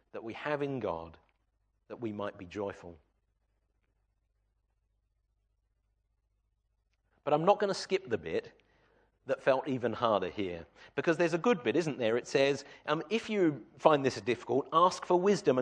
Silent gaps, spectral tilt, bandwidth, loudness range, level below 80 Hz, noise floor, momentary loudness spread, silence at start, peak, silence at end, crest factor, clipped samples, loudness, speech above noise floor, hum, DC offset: none; -5.5 dB/octave; 10 kHz; 15 LU; -70 dBFS; -78 dBFS; 13 LU; 0.15 s; -8 dBFS; 0 s; 26 dB; under 0.1%; -31 LUFS; 47 dB; none; under 0.1%